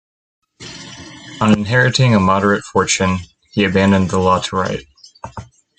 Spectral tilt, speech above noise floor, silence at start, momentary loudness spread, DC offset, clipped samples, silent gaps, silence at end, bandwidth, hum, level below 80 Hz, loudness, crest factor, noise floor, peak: -5 dB/octave; 20 dB; 0.6 s; 21 LU; under 0.1%; under 0.1%; none; 0.35 s; 9.2 kHz; none; -48 dBFS; -15 LUFS; 16 dB; -35 dBFS; 0 dBFS